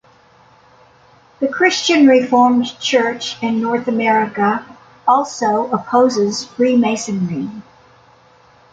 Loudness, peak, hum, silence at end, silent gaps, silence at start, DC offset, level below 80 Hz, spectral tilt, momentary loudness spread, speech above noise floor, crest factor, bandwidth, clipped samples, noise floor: -16 LUFS; -2 dBFS; none; 1.1 s; none; 1.4 s; under 0.1%; -60 dBFS; -4.5 dB/octave; 10 LU; 34 dB; 14 dB; 9 kHz; under 0.1%; -49 dBFS